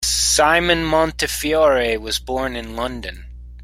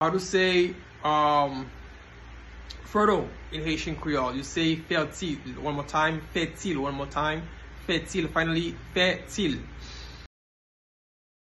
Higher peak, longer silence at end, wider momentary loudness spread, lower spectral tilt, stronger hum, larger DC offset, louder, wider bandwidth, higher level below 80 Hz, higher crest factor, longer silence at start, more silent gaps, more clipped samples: first, -2 dBFS vs -10 dBFS; second, 0 s vs 1.3 s; second, 12 LU vs 19 LU; second, -2.5 dB/octave vs -4.5 dB/octave; first, 60 Hz at -35 dBFS vs none; neither; first, -18 LUFS vs -27 LUFS; first, 16.5 kHz vs 12.5 kHz; first, -34 dBFS vs -46 dBFS; about the same, 18 dB vs 20 dB; about the same, 0 s vs 0 s; neither; neither